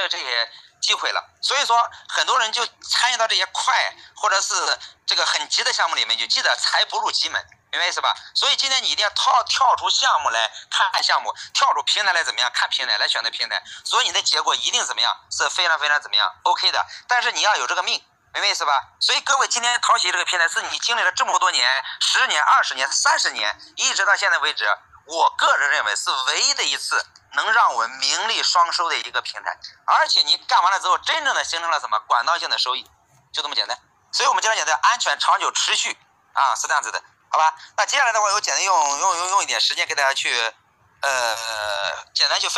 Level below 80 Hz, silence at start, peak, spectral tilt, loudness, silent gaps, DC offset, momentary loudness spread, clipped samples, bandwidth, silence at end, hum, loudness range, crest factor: -72 dBFS; 0 s; -4 dBFS; 3 dB/octave; -19 LUFS; none; under 0.1%; 7 LU; under 0.1%; 12.5 kHz; 0 s; none; 2 LU; 16 dB